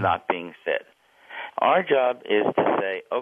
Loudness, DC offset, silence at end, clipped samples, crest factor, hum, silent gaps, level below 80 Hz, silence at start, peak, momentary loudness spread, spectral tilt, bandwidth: -24 LUFS; under 0.1%; 0 s; under 0.1%; 18 dB; none; none; -68 dBFS; 0 s; -6 dBFS; 11 LU; -7.5 dB/octave; 3.8 kHz